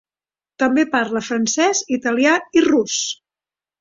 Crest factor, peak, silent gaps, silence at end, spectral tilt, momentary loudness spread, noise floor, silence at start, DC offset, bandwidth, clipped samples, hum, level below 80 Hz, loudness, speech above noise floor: 18 dB; -2 dBFS; none; 0.65 s; -2.5 dB/octave; 6 LU; under -90 dBFS; 0.6 s; under 0.1%; 7.8 kHz; under 0.1%; none; -62 dBFS; -18 LUFS; over 73 dB